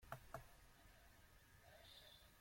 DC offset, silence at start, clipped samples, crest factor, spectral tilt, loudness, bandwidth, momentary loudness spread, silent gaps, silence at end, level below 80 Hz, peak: under 0.1%; 0 s; under 0.1%; 28 dB; -3.5 dB/octave; -63 LUFS; 16.5 kHz; 12 LU; none; 0 s; -72 dBFS; -34 dBFS